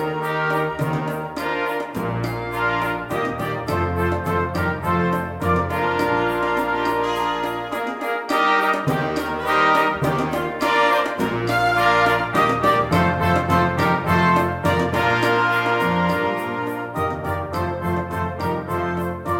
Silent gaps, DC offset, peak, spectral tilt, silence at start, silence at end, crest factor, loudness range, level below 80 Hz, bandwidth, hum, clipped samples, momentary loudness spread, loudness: none; under 0.1%; -4 dBFS; -6 dB/octave; 0 s; 0 s; 16 dB; 5 LU; -44 dBFS; 17 kHz; none; under 0.1%; 8 LU; -20 LUFS